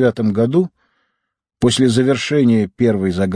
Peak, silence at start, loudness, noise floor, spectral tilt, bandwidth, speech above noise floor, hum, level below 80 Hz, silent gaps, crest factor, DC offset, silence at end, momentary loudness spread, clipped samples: -2 dBFS; 0 s; -16 LUFS; -75 dBFS; -6 dB/octave; 10.5 kHz; 60 dB; none; -50 dBFS; none; 14 dB; under 0.1%; 0 s; 4 LU; under 0.1%